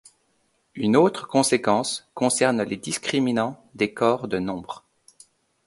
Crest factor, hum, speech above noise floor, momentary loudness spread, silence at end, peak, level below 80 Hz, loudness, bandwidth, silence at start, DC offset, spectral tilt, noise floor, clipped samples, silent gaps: 20 dB; none; 45 dB; 11 LU; 0.9 s; -4 dBFS; -62 dBFS; -23 LUFS; 12 kHz; 0.75 s; under 0.1%; -4 dB/octave; -68 dBFS; under 0.1%; none